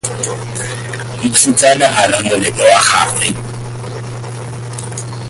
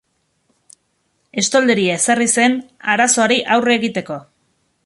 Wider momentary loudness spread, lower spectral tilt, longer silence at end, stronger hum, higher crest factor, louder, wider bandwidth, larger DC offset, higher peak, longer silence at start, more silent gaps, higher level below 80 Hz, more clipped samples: first, 16 LU vs 12 LU; about the same, -3 dB/octave vs -2.5 dB/octave; second, 0 s vs 0.65 s; neither; about the same, 14 dB vs 16 dB; first, -12 LUFS vs -15 LUFS; first, 14.5 kHz vs 11.5 kHz; neither; about the same, 0 dBFS vs -2 dBFS; second, 0.05 s vs 1.35 s; neither; first, -44 dBFS vs -62 dBFS; neither